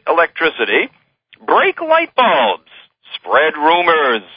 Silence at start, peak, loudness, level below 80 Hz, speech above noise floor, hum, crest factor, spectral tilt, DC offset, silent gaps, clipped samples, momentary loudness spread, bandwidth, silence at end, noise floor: 0.05 s; 0 dBFS; -14 LUFS; -64 dBFS; 29 dB; none; 16 dB; -8.5 dB/octave; under 0.1%; none; under 0.1%; 13 LU; 5.2 kHz; 0.15 s; -43 dBFS